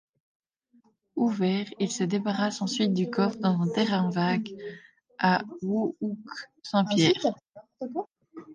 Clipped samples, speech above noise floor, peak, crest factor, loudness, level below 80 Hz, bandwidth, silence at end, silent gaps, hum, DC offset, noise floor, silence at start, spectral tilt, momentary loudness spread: under 0.1%; 38 dB; -8 dBFS; 20 dB; -27 LUFS; -72 dBFS; 9.8 kHz; 0 s; none; none; under 0.1%; -65 dBFS; 1.15 s; -5.5 dB/octave; 14 LU